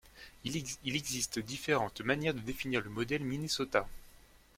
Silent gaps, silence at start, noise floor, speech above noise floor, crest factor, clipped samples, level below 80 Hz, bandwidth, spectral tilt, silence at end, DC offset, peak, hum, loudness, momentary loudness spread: none; 0.05 s; -59 dBFS; 24 dB; 24 dB; under 0.1%; -58 dBFS; 16.5 kHz; -3.5 dB/octave; 0.2 s; under 0.1%; -12 dBFS; none; -35 LUFS; 6 LU